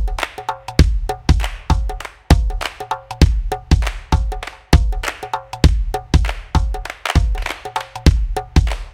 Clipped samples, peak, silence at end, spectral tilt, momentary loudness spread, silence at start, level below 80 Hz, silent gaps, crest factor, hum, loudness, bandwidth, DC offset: 0.1%; 0 dBFS; 0.05 s; -5.5 dB/octave; 10 LU; 0 s; -18 dBFS; none; 16 dB; none; -19 LUFS; 16 kHz; under 0.1%